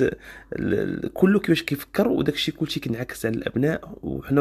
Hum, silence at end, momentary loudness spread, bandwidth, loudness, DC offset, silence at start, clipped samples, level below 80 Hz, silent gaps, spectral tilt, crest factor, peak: none; 0 s; 11 LU; 14.5 kHz; -24 LUFS; under 0.1%; 0 s; under 0.1%; -48 dBFS; none; -6 dB/octave; 18 dB; -6 dBFS